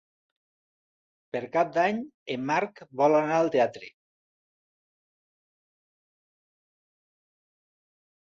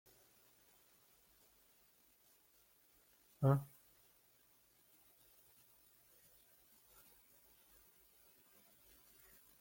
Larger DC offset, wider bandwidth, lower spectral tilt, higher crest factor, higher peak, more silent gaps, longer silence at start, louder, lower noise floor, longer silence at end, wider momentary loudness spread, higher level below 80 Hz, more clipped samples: neither; second, 7.4 kHz vs 17 kHz; second, -6 dB/octave vs -8 dB/octave; second, 20 dB vs 28 dB; first, -10 dBFS vs -22 dBFS; first, 2.14-2.26 s vs none; second, 1.35 s vs 3.4 s; first, -26 LUFS vs -38 LUFS; first, under -90 dBFS vs -72 dBFS; second, 4.4 s vs 5.95 s; second, 13 LU vs 18 LU; about the same, -76 dBFS vs -80 dBFS; neither